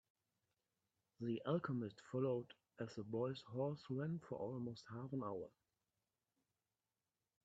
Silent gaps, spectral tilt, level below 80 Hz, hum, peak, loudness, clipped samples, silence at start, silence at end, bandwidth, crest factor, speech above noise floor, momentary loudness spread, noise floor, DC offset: none; -8 dB/octave; -84 dBFS; none; -28 dBFS; -46 LUFS; under 0.1%; 1.2 s; 1.95 s; 8 kHz; 20 dB; over 45 dB; 10 LU; under -90 dBFS; under 0.1%